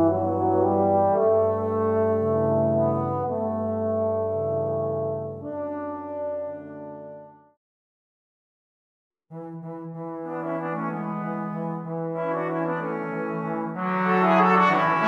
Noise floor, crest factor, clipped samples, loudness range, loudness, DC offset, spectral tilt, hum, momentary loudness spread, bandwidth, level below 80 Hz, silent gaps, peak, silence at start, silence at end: under -90 dBFS; 18 dB; under 0.1%; 16 LU; -25 LUFS; under 0.1%; -9 dB/octave; none; 16 LU; 7.4 kHz; -70 dBFS; 7.57-9.11 s; -8 dBFS; 0 s; 0 s